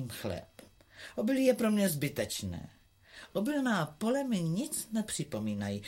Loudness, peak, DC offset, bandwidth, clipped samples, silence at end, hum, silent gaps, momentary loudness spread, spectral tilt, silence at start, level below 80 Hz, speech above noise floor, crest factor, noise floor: -33 LUFS; -14 dBFS; under 0.1%; 16.5 kHz; under 0.1%; 0 s; none; none; 15 LU; -5 dB/octave; 0 s; -64 dBFS; 23 dB; 20 dB; -55 dBFS